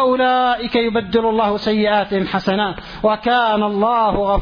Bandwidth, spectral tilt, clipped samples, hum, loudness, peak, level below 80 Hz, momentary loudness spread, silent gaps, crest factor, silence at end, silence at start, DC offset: 5.4 kHz; -7 dB/octave; under 0.1%; none; -17 LUFS; -2 dBFS; -38 dBFS; 4 LU; none; 14 dB; 0 s; 0 s; under 0.1%